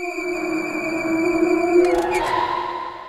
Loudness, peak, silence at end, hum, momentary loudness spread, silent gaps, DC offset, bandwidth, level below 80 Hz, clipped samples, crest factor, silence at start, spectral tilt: -20 LUFS; -6 dBFS; 0 s; none; 8 LU; none; under 0.1%; 14.5 kHz; -48 dBFS; under 0.1%; 16 dB; 0 s; -4.5 dB/octave